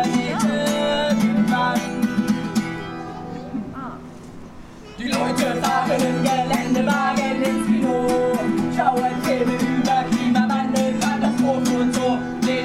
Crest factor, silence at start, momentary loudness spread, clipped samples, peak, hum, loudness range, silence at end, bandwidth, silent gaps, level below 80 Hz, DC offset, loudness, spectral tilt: 16 dB; 0 s; 13 LU; under 0.1%; -6 dBFS; none; 6 LU; 0 s; 15.5 kHz; none; -48 dBFS; under 0.1%; -20 LUFS; -5 dB/octave